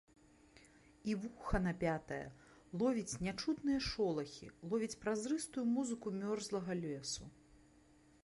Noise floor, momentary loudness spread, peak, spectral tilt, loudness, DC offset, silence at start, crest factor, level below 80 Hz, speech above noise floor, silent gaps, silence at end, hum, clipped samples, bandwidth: -67 dBFS; 10 LU; -22 dBFS; -5 dB/octave; -40 LUFS; under 0.1%; 0.55 s; 18 dB; -56 dBFS; 28 dB; none; 0.7 s; none; under 0.1%; 11.5 kHz